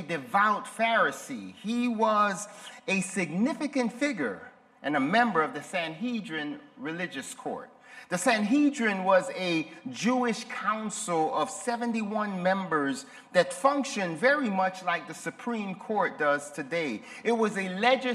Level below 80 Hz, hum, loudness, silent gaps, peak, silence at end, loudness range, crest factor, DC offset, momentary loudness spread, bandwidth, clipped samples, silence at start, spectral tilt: -78 dBFS; none; -28 LUFS; none; -8 dBFS; 0 s; 3 LU; 20 dB; under 0.1%; 12 LU; 14 kHz; under 0.1%; 0 s; -4.5 dB/octave